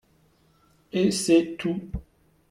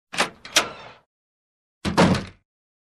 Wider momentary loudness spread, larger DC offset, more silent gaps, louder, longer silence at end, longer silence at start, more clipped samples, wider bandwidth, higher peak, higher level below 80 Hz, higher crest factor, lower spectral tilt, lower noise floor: about the same, 16 LU vs 18 LU; neither; second, none vs 1.06-1.81 s; about the same, -24 LUFS vs -22 LUFS; about the same, 0.5 s vs 0.5 s; first, 0.95 s vs 0.15 s; neither; about the same, 14 kHz vs 14 kHz; second, -8 dBFS vs -4 dBFS; about the same, -48 dBFS vs -48 dBFS; about the same, 18 dB vs 22 dB; first, -5 dB/octave vs -3.5 dB/octave; second, -62 dBFS vs under -90 dBFS